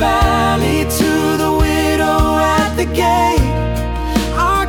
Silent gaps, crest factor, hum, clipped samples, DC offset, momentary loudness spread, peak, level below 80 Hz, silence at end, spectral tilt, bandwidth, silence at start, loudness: none; 12 dB; none; under 0.1%; under 0.1%; 5 LU; -2 dBFS; -22 dBFS; 0 s; -5 dB/octave; 18 kHz; 0 s; -15 LUFS